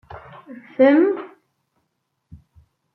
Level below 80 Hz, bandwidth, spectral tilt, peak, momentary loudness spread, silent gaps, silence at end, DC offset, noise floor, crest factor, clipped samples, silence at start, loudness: -60 dBFS; 5.6 kHz; -9 dB/octave; -2 dBFS; 26 LU; none; 1.7 s; under 0.1%; -74 dBFS; 20 dB; under 0.1%; 0.15 s; -17 LUFS